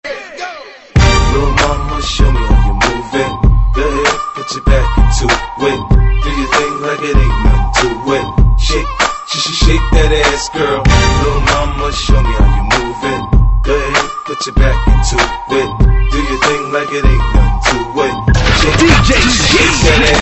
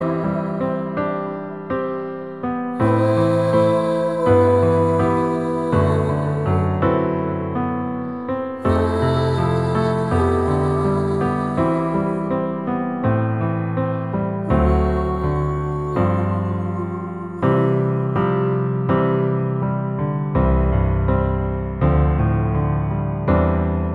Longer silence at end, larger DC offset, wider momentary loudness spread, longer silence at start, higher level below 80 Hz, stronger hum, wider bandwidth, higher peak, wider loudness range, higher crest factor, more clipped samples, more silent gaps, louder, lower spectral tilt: about the same, 0 s vs 0 s; second, under 0.1% vs 0.3%; about the same, 8 LU vs 7 LU; about the same, 0.05 s vs 0 s; first, -14 dBFS vs -30 dBFS; neither; second, 8.4 kHz vs 11 kHz; first, 0 dBFS vs -4 dBFS; about the same, 2 LU vs 3 LU; second, 10 dB vs 16 dB; neither; neither; first, -12 LUFS vs -20 LUFS; second, -4.5 dB/octave vs -9 dB/octave